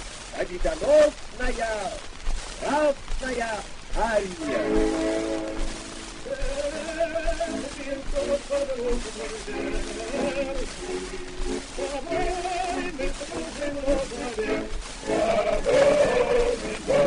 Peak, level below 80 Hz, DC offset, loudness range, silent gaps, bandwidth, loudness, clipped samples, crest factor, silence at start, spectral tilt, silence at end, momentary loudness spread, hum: -8 dBFS; -34 dBFS; under 0.1%; 6 LU; none; 10.5 kHz; -27 LUFS; under 0.1%; 18 dB; 0 s; -4 dB/octave; 0 s; 13 LU; none